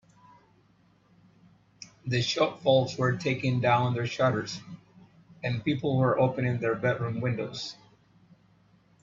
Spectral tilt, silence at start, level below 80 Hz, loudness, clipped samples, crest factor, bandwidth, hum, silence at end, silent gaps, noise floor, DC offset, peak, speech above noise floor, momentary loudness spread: -6 dB/octave; 1.8 s; -64 dBFS; -28 LUFS; under 0.1%; 20 dB; 7.6 kHz; none; 1.3 s; none; -63 dBFS; under 0.1%; -10 dBFS; 36 dB; 15 LU